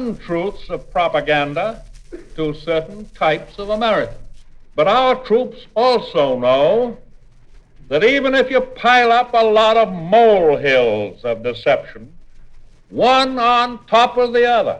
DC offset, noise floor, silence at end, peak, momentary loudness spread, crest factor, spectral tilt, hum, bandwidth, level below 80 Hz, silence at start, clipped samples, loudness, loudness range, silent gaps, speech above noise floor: under 0.1%; -43 dBFS; 0 s; 0 dBFS; 11 LU; 16 dB; -5 dB/octave; none; 9.6 kHz; -42 dBFS; 0 s; under 0.1%; -16 LUFS; 7 LU; none; 27 dB